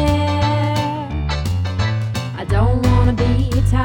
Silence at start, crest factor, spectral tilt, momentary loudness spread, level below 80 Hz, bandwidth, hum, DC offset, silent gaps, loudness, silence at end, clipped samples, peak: 0 s; 14 dB; -7 dB/octave; 7 LU; -24 dBFS; 15.5 kHz; none; under 0.1%; none; -18 LUFS; 0 s; under 0.1%; -2 dBFS